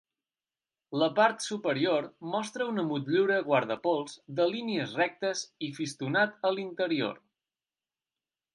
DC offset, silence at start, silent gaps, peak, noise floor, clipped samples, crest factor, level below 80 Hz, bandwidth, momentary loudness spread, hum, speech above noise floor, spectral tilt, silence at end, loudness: under 0.1%; 0.9 s; none; -12 dBFS; under -90 dBFS; under 0.1%; 20 dB; -82 dBFS; 11.5 kHz; 9 LU; none; over 61 dB; -4.5 dB/octave; 1.35 s; -30 LUFS